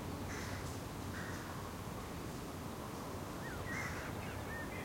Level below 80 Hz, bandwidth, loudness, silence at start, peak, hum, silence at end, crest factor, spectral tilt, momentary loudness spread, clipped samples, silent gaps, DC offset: -56 dBFS; 16.5 kHz; -44 LUFS; 0 s; -30 dBFS; none; 0 s; 14 dB; -5 dB/octave; 4 LU; under 0.1%; none; under 0.1%